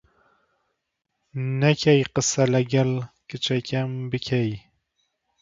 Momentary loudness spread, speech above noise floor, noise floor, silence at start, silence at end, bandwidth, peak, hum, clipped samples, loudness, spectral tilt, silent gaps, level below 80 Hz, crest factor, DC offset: 12 LU; 57 dB; -79 dBFS; 1.35 s; 0.8 s; 7.8 kHz; -4 dBFS; none; under 0.1%; -23 LUFS; -5 dB/octave; none; -58 dBFS; 20 dB; under 0.1%